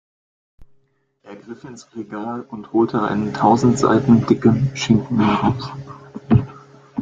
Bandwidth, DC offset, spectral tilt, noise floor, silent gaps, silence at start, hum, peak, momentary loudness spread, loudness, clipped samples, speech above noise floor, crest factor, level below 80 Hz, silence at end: 7.8 kHz; under 0.1%; -7 dB/octave; -61 dBFS; none; 0.6 s; none; -2 dBFS; 21 LU; -18 LUFS; under 0.1%; 43 dB; 18 dB; -46 dBFS; 0 s